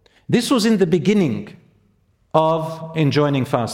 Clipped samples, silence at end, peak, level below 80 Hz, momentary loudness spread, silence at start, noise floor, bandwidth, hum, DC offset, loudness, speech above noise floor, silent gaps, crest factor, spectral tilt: under 0.1%; 0 s; 0 dBFS; -56 dBFS; 8 LU; 0.3 s; -60 dBFS; 16.5 kHz; none; under 0.1%; -18 LUFS; 42 dB; none; 18 dB; -6 dB/octave